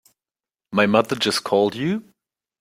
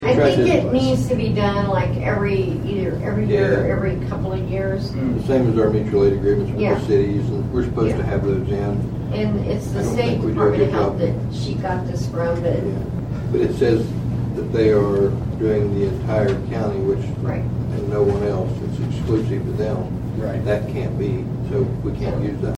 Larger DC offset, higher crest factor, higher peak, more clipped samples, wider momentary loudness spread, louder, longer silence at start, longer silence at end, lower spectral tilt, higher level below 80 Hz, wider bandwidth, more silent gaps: neither; about the same, 20 dB vs 16 dB; about the same, -2 dBFS vs -4 dBFS; neither; about the same, 8 LU vs 7 LU; about the same, -20 LUFS vs -20 LUFS; first, 0.7 s vs 0 s; first, 0.6 s vs 0 s; second, -4.5 dB/octave vs -8 dB/octave; second, -62 dBFS vs -36 dBFS; first, 16 kHz vs 11 kHz; neither